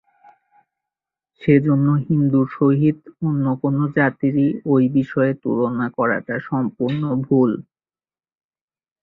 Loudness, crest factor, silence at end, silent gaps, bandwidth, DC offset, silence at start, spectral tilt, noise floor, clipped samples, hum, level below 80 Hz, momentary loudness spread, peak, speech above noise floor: -19 LUFS; 18 dB; 1.4 s; none; 4.1 kHz; under 0.1%; 1.4 s; -11.5 dB/octave; under -90 dBFS; under 0.1%; none; -58 dBFS; 7 LU; -2 dBFS; over 72 dB